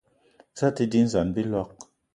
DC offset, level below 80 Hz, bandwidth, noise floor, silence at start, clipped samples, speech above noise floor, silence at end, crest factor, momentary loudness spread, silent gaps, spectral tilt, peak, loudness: under 0.1%; -52 dBFS; 10.5 kHz; -60 dBFS; 0.55 s; under 0.1%; 36 dB; 0.3 s; 18 dB; 13 LU; none; -7 dB/octave; -8 dBFS; -25 LUFS